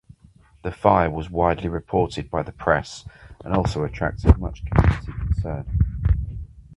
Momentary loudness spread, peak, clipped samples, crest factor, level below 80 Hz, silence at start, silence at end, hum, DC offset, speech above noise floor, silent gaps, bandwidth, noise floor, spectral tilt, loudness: 15 LU; 0 dBFS; under 0.1%; 22 dB; -28 dBFS; 0.65 s; 0 s; none; under 0.1%; 31 dB; none; 10.5 kHz; -53 dBFS; -7.5 dB/octave; -23 LUFS